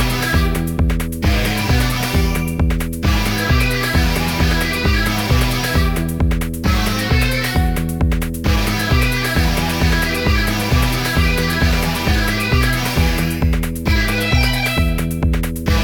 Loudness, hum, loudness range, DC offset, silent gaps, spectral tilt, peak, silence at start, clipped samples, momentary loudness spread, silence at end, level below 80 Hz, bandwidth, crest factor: -17 LUFS; none; 1 LU; under 0.1%; none; -5 dB/octave; -2 dBFS; 0 s; under 0.1%; 3 LU; 0 s; -20 dBFS; over 20 kHz; 14 dB